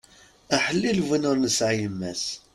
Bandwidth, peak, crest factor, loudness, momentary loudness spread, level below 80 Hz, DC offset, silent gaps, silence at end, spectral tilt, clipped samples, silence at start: 14.5 kHz; -6 dBFS; 18 dB; -24 LUFS; 7 LU; -58 dBFS; under 0.1%; none; 0.15 s; -4 dB/octave; under 0.1%; 0.5 s